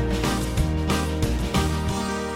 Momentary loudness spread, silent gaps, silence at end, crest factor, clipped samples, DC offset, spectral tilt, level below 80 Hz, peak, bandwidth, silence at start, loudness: 2 LU; none; 0 s; 16 dB; under 0.1%; under 0.1%; -5.5 dB/octave; -28 dBFS; -8 dBFS; 16.5 kHz; 0 s; -24 LUFS